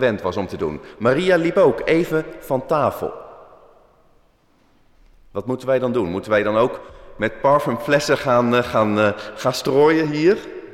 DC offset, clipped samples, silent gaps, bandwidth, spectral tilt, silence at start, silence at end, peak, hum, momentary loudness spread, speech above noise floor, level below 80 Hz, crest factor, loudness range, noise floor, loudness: under 0.1%; under 0.1%; none; 16 kHz; -6 dB/octave; 0 s; 0 s; -6 dBFS; none; 10 LU; 39 dB; -50 dBFS; 14 dB; 9 LU; -58 dBFS; -19 LUFS